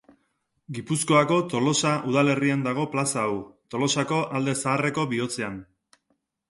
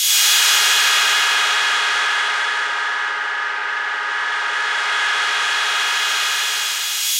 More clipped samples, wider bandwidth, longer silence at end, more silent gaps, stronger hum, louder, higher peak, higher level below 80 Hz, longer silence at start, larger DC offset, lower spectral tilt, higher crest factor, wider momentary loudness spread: neither; second, 11.5 kHz vs 16 kHz; first, 0.85 s vs 0 s; neither; neither; second, -24 LUFS vs -16 LUFS; second, -8 dBFS vs -2 dBFS; first, -64 dBFS vs -82 dBFS; first, 0.7 s vs 0 s; neither; first, -4.5 dB/octave vs 5 dB/octave; about the same, 18 dB vs 16 dB; first, 12 LU vs 9 LU